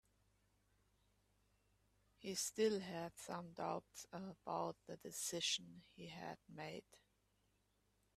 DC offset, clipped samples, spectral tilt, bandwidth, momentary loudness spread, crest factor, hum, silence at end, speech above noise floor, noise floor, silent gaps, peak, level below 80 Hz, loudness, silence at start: under 0.1%; under 0.1%; -3 dB/octave; 15 kHz; 15 LU; 22 dB; 50 Hz at -75 dBFS; 1.2 s; 35 dB; -81 dBFS; none; -26 dBFS; -82 dBFS; -46 LUFS; 2.2 s